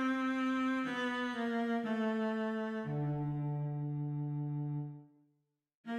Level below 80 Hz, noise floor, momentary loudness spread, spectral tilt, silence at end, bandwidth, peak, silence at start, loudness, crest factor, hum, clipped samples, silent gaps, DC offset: -72 dBFS; -80 dBFS; 5 LU; -7.5 dB/octave; 0 s; 9.2 kHz; -24 dBFS; 0 s; -36 LUFS; 12 dB; none; under 0.1%; 5.75-5.84 s; under 0.1%